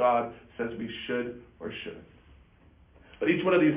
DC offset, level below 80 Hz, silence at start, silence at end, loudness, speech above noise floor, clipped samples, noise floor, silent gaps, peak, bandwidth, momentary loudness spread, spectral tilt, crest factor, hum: under 0.1%; -60 dBFS; 0 s; 0 s; -30 LUFS; 30 dB; under 0.1%; -58 dBFS; none; -12 dBFS; 3.9 kHz; 16 LU; -4.5 dB/octave; 18 dB; none